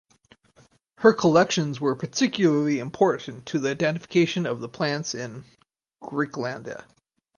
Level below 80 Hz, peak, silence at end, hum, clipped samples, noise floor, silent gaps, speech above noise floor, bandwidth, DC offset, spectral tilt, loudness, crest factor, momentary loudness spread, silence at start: -66 dBFS; -4 dBFS; 0.55 s; none; under 0.1%; -60 dBFS; none; 36 dB; 10 kHz; under 0.1%; -5 dB/octave; -24 LUFS; 22 dB; 15 LU; 1 s